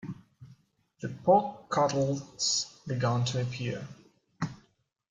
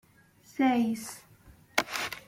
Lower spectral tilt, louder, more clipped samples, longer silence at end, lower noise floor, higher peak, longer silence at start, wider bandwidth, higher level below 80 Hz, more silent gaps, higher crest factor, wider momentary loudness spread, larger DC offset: first, -4.5 dB/octave vs -3 dB/octave; about the same, -30 LUFS vs -29 LUFS; neither; first, 0.55 s vs 0.1 s; first, -70 dBFS vs -60 dBFS; second, -10 dBFS vs -6 dBFS; second, 0.05 s vs 0.55 s; second, 9.6 kHz vs 16.5 kHz; about the same, -66 dBFS vs -66 dBFS; neither; second, 20 dB vs 26 dB; about the same, 16 LU vs 18 LU; neither